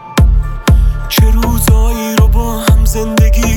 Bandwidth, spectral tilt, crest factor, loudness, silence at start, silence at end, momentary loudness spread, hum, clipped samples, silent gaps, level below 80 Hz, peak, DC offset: 18 kHz; -5.5 dB/octave; 10 dB; -12 LUFS; 0 s; 0 s; 3 LU; none; under 0.1%; none; -10 dBFS; 0 dBFS; under 0.1%